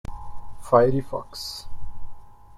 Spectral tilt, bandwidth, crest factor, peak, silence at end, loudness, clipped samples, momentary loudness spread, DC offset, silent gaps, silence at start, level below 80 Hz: -6 dB/octave; 14.5 kHz; 22 dB; -4 dBFS; 0 s; -23 LUFS; under 0.1%; 26 LU; under 0.1%; none; 0.1 s; -40 dBFS